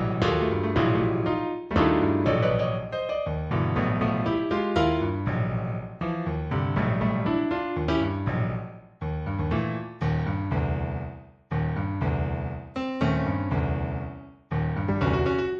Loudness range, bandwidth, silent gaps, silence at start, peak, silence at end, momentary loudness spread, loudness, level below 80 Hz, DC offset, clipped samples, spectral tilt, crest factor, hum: 4 LU; 7.4 kHz; none; 0 s; -10 dBFS; 0 s; 9 LU; -27 LUFS; -38 dBFS; under 0.1%; under 0.1%; -8.5 dB/octave; 16 dB; none